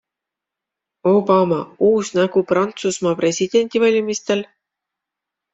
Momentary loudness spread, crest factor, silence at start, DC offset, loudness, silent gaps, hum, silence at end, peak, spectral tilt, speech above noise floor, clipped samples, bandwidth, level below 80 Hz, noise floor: 6 LU; 16 dB; 1.05 s; under 0.1%; -18 LUFS; none; none; 1.1 s; -2 dBFS; -5 dB/octave; 68 dB; under 0.1%; 8.2 kHz; -62 dBFS; -85 dBFS